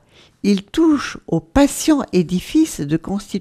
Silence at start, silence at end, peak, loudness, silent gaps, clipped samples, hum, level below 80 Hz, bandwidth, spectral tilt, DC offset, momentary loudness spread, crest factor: 0.45 s; 0 s; 0 dBFS; -18 LUFS; none; under 0.1%; none; -38 dBFS; 15 kHz; -5.5 dB/octave; under 0.1%; 7 LU; 18 dB